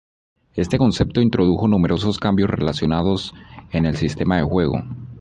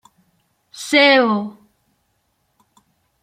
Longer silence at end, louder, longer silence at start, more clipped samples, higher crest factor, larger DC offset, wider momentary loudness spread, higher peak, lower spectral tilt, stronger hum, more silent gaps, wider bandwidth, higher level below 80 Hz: second, 0 s vs 1.75 s; second, -19 LUFS vs -14 LUFS; second, 0.55 s vs 0.75 s; neither; about the same, 16 dB vs 20 dB; neither; second, 9 LU vs 21 LU; second, -4 dBFS vs 0 dBFS; first, -7 dB/octave vs -3.5 dB/octave; neither; neither; second, 11 kHz vs 15.5 kHz; first, -36 dBFS vs -72 dBFS